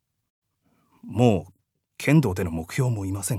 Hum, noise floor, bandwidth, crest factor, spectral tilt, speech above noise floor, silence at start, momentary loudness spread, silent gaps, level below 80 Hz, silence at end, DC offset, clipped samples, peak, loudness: none; -68 dBFS; 16 kHz; 20 dB; -6.5 dB/octave; 46 dB; 1.05 s; 8 LU; none; -56 dBFS; 0 s; under 0.1%; under 0.1%; -4 dBFS; -24 LUFS